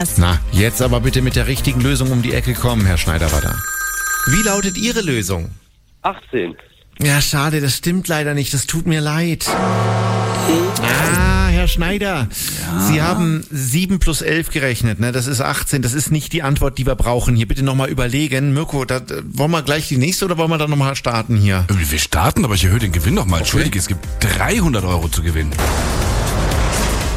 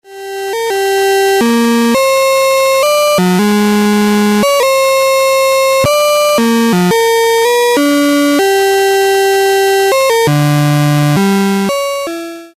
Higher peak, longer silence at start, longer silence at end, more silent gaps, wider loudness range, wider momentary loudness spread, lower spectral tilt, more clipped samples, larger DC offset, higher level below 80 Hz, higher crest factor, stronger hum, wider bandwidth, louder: about the same, -2 dBFS vs -4 dBFS; about the same, 0 s vs 0.1 s; about the same, 0 s vs 0.1 s; neither; about the same, 2 LU vs 1 LU; about the same, 5 LU vs 4 LU; about the same, -4.5 dB/octave vs -4.5 dB/octave; neither; neither; first, -24 dBFS vs -48 dBFS; first, 14 dB vs 6 dB; neither; about the same, 16.5 kHz vs 15.5 kHz; second, -17 LUFS vs -10 LUFS